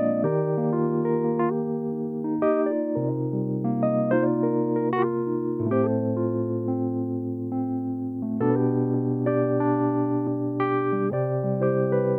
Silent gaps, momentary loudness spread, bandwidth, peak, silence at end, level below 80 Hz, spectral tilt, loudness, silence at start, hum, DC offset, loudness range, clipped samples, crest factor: none; 5 LU; 3.9 kHz; -10 dBFS; 0 s; -68 dBFS; -12 dB/octave; -25 LUFS; 0 s; none; under 0.1%; 2 LU; under 0.1%; 14 dB